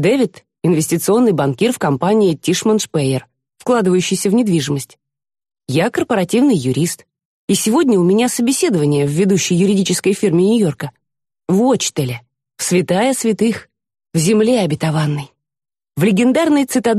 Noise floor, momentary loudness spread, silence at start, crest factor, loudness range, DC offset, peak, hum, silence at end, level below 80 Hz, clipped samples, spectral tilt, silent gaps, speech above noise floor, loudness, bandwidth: -80 dBFS; 10 LU; 0 s; 12 dB; 3 LU; under 0.1%; -4 dBFS; none; 0 s; -56 dBFS; under 0.1%; -5.5 dB/octave; 7.25-7.48 s; 65 dB; -15 LUFS; 13 kHz